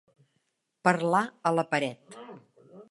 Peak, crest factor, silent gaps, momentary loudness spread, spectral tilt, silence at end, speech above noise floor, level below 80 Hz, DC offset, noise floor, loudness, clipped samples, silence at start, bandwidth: -6 dBFS; 24 dB; none; 21 LU; -5.5 dB/octave; 0.1 s; 50 dB; -80 dBFS; under 0.1%; -77 dBFS; -27 LUFS; under 0.1%; 0.85 s; 11.5 kHz